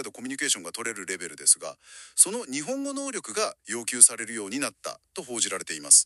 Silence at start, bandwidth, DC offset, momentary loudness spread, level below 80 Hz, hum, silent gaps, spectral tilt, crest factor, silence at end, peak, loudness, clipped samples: 0 s; 13.5 kHz; under 0.1%; 17 LU; -78 dBFS; none; none; 0 dB/octave; 26 dB; 0 s; 0 dBFS; -24 LUFS; under 0.1%